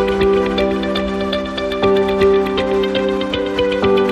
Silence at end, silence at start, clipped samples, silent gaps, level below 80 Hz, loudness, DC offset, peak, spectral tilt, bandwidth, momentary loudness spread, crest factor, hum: 0 s; 0 s; under 0.1%; none; -36 dBFS; -16 LUFS; under 0.1%; -2 dBFS; -6 dB/octave; 10 kHz; 5 LU; 14 dB; none